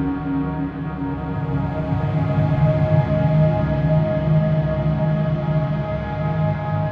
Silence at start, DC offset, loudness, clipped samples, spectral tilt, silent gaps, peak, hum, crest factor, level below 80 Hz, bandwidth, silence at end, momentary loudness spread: 0 s; under 0.1%; -20 LUFS; under 0.1%; -10.5 dB/octave; none; -6 dBFS; none; 14 dB; -34 dBFS; 4.7 kHz; 0 s; 7 LU